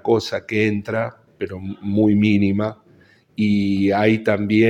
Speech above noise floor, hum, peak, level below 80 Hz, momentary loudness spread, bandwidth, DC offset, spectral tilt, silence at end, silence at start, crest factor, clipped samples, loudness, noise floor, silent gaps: 34 dB; none; -2 dBFS; -56 dBFS; 13 LU; 8.2 kHz; under 0.1%; -7.5 dB/octave; 0 s; 0.05 s; 18 dB; under 0.1%; -20 LUFS; -52 dBFS; none